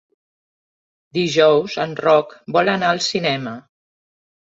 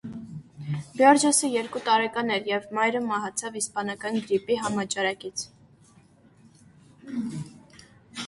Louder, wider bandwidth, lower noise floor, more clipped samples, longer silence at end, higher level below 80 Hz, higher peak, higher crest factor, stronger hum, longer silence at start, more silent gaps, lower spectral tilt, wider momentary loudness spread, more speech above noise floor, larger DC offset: first, -18 LUFS vs -25 LUFS; second, 8 kHz vs 11.5 kHz; first, under -90 dBFS vs -56 dBFS; neither; first, 1 s vs 0 s; about the same, -62 dBFS vs -66 dBFS; first, 0 dBFS vs -6 dBFS; about the same, 20 dB vs 22 dB; neither; first, 1.15 s vs 0.05 s; neither; about the same, -4.5 dB/octave vs -3.5 dB/octave; second, 11 LU vs 19 LU; first, over 72 dB vs 31 dB; neither